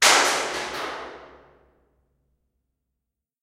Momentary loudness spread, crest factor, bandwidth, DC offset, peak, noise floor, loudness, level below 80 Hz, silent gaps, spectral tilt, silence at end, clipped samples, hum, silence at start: 23 LU; 24 dB; 16 kHz; under 0.1%; -2 dBFS; -83 dBFS; -22 LUFS; -62 dBFS; none; 0.5 dB/octave; 2.15 s; under 0.1%; none; 0 s